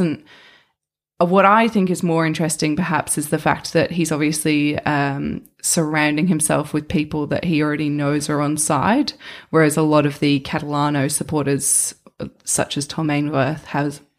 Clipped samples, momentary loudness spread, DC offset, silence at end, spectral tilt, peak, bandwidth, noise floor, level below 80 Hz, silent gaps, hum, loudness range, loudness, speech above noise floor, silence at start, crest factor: under 0.1%; 7 LU; under 0.1%; 0.2 s; -4.5 dB/octave; -2 dBFS; 15.5 kHz; -75 dBFS; -50 dBFS; none; none; 2 LU; -19 LUFS; 57 dB; 0 s; 18 dB